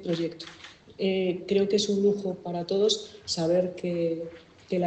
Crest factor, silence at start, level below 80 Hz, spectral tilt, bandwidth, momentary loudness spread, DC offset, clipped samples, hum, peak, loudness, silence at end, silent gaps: 18 dB; 0 s; -68 dBFS; -5 dB/octave; 9 kHz; 15 LU; under 0.1%; under 0.1%; none; -10 dBFS; -27 LUFS; 0 s; none